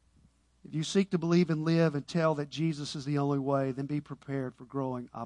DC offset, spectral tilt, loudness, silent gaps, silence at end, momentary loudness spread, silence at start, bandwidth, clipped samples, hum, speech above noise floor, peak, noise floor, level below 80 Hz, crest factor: under 0.1%; -6.5 dB/octave; -31 LUFS; none; 0 s; 10 LU; 0.65 s; 10.5 kHz; under 0.1%; none; 35 dB; -14 dBFS; -65 dBFS; -68 dBFS; 16 dB